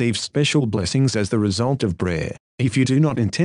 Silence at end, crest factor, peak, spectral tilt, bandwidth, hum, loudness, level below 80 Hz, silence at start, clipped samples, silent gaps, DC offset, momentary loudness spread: 0 s; 14 dB; -6 dBFS; -5.5 dB/octave; 11 kHz; none; -20 LUFS; -46 dBFS; 0 s; under 0.1%; 2.40-2.58 s; under 0.1%; 6 LU